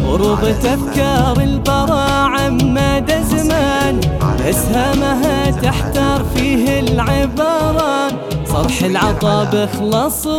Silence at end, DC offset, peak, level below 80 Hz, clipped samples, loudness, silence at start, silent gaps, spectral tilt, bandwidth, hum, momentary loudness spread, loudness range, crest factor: 0 s; under 0.1%; 0 dBFS; -24 dBFS; under 0.1%; -15 LUFS; 0 s; none; -5.5 dB/octave; 18.5 kHz; none; 2 LU; 1 LU; 14 dB